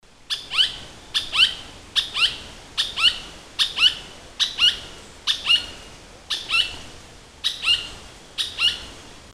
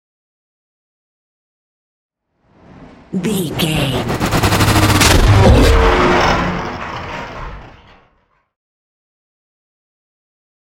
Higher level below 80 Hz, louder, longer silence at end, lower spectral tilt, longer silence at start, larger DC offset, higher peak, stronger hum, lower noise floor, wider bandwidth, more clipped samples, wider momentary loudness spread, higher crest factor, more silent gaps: second, -48 dBFS vs -24 dBFS; second, -20 LUFS vs -13 LUFS; second, 0 s vs 3.1 s; second, 0.5 dB/octave vs -5 dB/octave; second, 0.3 s vs 2.8 s; neither; second, -4 dBFS vs 0 dBFS; neither; second, -44 dBFS vs -59 dBFS; second, 15 kHz vs 17 kHz; neither; about the same, 18 LU vs 16 LU; about the same, 20 dB vs 16 dB; neither